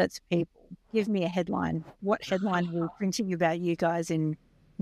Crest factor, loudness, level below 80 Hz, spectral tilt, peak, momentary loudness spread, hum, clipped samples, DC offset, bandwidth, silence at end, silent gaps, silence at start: 16 dB; -30 LUFS; -62 dBFS; -6 dB/octave; -12 dBFS; 6 LU; none; under 0.1%; under 0.1%; 14 kHz; 0.45 s; none; 0 s